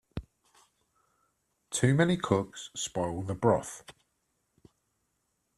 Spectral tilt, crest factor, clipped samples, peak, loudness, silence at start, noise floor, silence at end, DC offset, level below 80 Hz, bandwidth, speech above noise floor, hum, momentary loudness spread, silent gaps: -5.5 dB/octave; 24 dB; under 0.1%; -10 dBFS; -29 LUFS; 0.15 s; -78 dBFS; 1.65 s; under 0.1%; -58 dBFS; 14 kHz; 49 dB; none; 18 LU; none